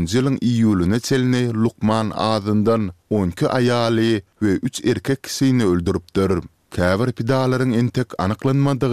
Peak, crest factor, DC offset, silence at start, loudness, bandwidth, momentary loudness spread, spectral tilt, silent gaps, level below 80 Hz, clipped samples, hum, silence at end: -2 dBFS; 16 dB; 0.3%; 0 s; -19 LUFS; 15 kHz; 5 LU; -6.5 dB/octave; none; -46 dBFS; under 0.1%; none; 0 s